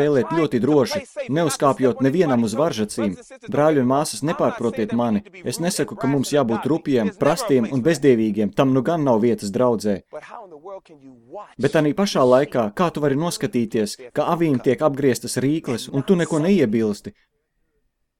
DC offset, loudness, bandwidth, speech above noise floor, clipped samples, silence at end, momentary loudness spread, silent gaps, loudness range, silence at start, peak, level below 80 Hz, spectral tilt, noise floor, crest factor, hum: under 0.1%; -20 LUFS; 17 kHz; 50 dB; under 0.1%; 1.1 s; 9 LU; none; 3 LU; 0 s; -2 dBFS; -56 dBFS; -6 dB/octave; -70 dBFS; 18 dB; none